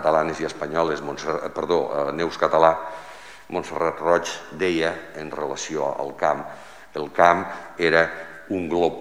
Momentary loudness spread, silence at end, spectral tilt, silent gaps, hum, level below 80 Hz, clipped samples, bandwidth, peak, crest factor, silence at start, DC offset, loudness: 15 LU; 0 s; -4.5 dB/octave; none; none; -56 dBFS; under 0.1%; 16 kHz; 0 dBFS; 22 dB; 0 s; 0.4%; -23 LUFS